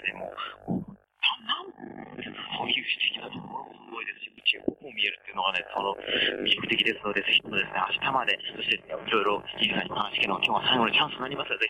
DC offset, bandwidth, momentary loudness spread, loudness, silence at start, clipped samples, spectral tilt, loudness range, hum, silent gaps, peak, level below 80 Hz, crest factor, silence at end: under 0.1%; 14.5 kHz; 15 LU; -27 LUFS; 0 s; under 0.1%; -4.5 dB/octave; 5 LU; none; none; -10 dBFS; -64 dBFS; 20 dB; 0 s